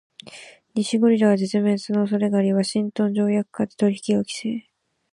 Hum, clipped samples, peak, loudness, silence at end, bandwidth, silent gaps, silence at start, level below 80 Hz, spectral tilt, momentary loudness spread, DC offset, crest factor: none; under 0.1%; -6 dBFS; -22 LUFS; 0.5 s; 11.5 kHz; none; 0.25 s; -68 dBFS; -6 dB/octave; 13 LU; under 0.1%; 16 dB